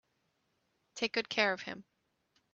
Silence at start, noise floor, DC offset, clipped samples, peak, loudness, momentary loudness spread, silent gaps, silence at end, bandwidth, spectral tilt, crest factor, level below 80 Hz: 0.95 s; -79 dBFS; under 0.1%; under 0.1%; -12 dBFS; -33 LUFS; 18 LU; none; 0.7 s; 8.2 kHz; -2.5 dB/octave; 26 dB; -80 dBFS